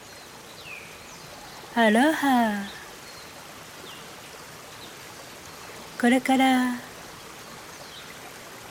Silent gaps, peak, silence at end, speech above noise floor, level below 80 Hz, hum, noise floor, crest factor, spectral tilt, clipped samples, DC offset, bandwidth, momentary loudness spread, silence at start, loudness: none; -8 dBFS; 0 s; 23 dB; -64 dBFS; none; -44 dBFS; 20 dB; -4 dB/octave; under 0.1%; under 0.1%; 19 kHz; 21 LU; 0 s; -23 LUFS